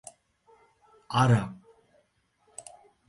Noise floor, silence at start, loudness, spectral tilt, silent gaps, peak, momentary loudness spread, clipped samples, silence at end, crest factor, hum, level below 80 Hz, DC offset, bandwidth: -70 dBFS; 1.1 s; -26 LUFS; -6 dB/octave; none; -10 dBFS; 27 LU; under 0.1%; 1.55 s; 22 dB; none; -60 dBFS; under 0.1%; 11.5 kHz